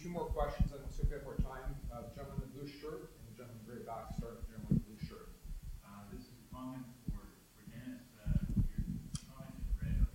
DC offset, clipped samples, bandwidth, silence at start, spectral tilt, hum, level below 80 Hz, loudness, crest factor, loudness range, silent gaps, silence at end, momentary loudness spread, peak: under 0.1%; under 0.1%; 16 kHz; 0 s; -7.5 dB/octave; none; -44 dBFS; -43 LUFS; 20 dB; 5 LU; none; 0 s; 16 LU; -20 dBFS